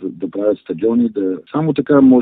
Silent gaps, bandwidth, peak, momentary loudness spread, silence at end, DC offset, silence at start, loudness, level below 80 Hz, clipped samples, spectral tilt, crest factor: none; 4 kHz; 0 dBFS; 9 LU; 0 s; under 0.1%; 0 s; -16 LUFS; -54 dBFS; under 0.1%; -12.5 dB/octave; 14 dB